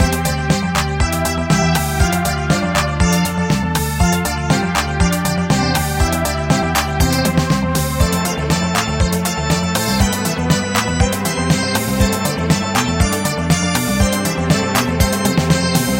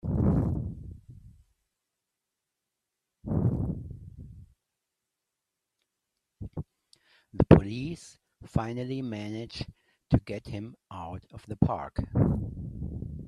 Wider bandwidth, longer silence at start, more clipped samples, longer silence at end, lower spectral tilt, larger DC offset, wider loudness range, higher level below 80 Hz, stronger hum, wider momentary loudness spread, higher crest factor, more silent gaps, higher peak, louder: first, 17 kHz vs 11 kHz; about the same, 0 s vs 0.05 s; neither; about the same, 0 s vs 0 s; second, -4.5 dB/octave vs -9 dB/octave; neither; second, 1 LU vs 10 LU; first, -26 dBFS vs -44 dBFS; neither; second, 3 LU vs 20 LU; second, 16 dB vs 30 dB; neither; about the same, 0 dBFS vs 0 dBFS; first, -16 LUFS vs -29 LUFS